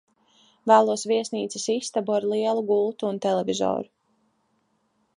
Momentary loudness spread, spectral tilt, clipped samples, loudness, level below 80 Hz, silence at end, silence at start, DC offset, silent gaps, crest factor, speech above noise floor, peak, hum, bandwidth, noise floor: 10 LU; -4 dB/octave; under 0.1%; -24 LUFS; -72 dBFS; 1.35 s; 0.65 s; under 0.1%; none; 22 dB; 47 dB; -4 dBFS; none; 11 kHz; -70 dBFS